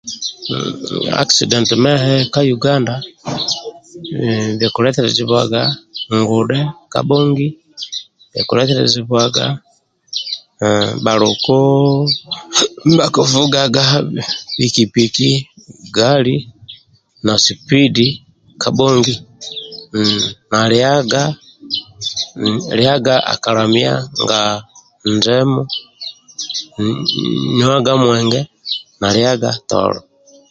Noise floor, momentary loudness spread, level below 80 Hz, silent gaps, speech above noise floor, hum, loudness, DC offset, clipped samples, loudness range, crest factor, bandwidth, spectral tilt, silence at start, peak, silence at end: -47 dBFS; 12 LU; -50 dBFS; none; 33 dB; none; -14 LUFS; under 0.1%; under 0.1%; 3 LU; 16 dB; 9.2 kHz; -4.5 dB/octave; 0.05 s; 0 dBFS; 0.5 s